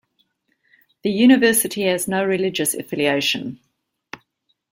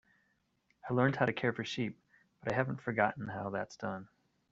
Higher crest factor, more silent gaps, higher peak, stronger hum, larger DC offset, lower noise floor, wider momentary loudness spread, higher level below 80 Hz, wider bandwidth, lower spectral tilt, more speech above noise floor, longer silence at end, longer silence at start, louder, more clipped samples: about the same, 18 dB vs 22 dB; neither; first, -4 dBFS vs -14 dBFS; neither; neither; second, -71 dBFS vs -77 dBFS; first, 25 LU vs 11 LU; first, -62 dBFS vs -70 dBFS; first, 16.5 kHz vs 7.8 kHz; second, -3.5 dB/octave vs -5 dB/octave; first, 52 dB vs 42 dB; about the same, 0.55 s vs 0.45 s; first, 1.05 s vs 0.85 s; first, -18 LUFS vs -35 LUFS; neither